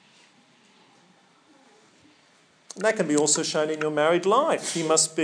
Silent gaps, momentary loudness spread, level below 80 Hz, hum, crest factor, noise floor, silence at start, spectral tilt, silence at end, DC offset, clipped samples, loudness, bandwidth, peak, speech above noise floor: none; 5 LU; -90 dBFS; none; 20 dB; -60 dBFS; 2.75 s; -2.5 dB/octave; 0 s; under 0.1%; under 0.1%; -23 LUFS; 10.5 kHz; -6 dBFS; 37 dB